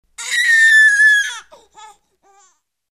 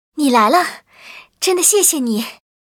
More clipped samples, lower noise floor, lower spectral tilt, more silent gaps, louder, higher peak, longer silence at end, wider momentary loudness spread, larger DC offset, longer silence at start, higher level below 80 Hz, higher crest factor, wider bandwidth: neither; first, -57 dBFS vs -41 dBFS; second, 5.5 dB/octave vs -1.5 dB/octave; neither; first, -10 LUFS vs -14 LUFS; second, -4 dBFS vs 0 dBFS; first, 1.5 s vs 0.45 s; first, 15 LU vs 12 LU; neither; about the same, 0.2 s vs 0.15 s; about the same, -66 dBFS vs -70 dBFS; about the same, 12 dB vs 16 dB; second, 13.5 kHz vs over 20 kHz